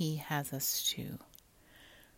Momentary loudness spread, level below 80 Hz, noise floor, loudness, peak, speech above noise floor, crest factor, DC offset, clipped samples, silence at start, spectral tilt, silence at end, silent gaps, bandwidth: 14 LU; -68 dBFS; -61 dBFS; -35 LUFS; -20 dBFS; 25 dB; 18 dB; under 0.1%; under 0.1%; 0 s; -3 dB/octave; 0.15 s; none; 16.5 kHz